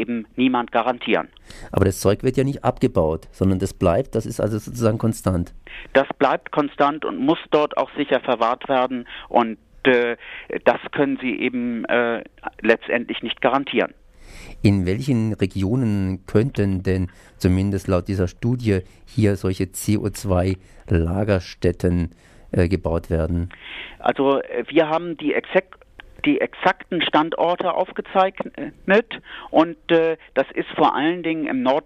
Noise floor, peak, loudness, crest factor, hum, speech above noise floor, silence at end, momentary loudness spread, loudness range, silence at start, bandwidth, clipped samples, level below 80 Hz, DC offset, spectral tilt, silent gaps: -41 dBFS; -2 dBFS; -21 LUFS; 18 dB; none; 20 dB; 0.05 s; 6 LU; 2 LU; 0 s; 15 kHz; under 0.1%; -42 dBFS; under 0.1%; -6.5 dB/octave; none